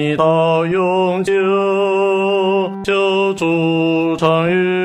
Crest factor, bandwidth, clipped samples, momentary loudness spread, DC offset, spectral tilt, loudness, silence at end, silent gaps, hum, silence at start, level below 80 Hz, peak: 14 dB; 10 kHz; under 0.1%; 2 LU; under 0.1%; -6.5 dB/octave; -15 LUFS; 0 s; none; none; 0 s; -56 dBFS; 0 dBFS